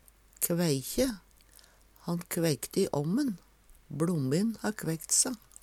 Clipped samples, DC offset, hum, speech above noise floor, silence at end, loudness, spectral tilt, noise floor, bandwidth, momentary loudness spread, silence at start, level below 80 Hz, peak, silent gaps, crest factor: under 0.1%; under 0.1%; none; 29 dB; 0.25 s; -30 LUFS; -4.5 dB/octave; -59 dBFS; 17 kHz; 11 LU; 0.4 s; -58 dBFS; -12 dBFS; none; 20 dB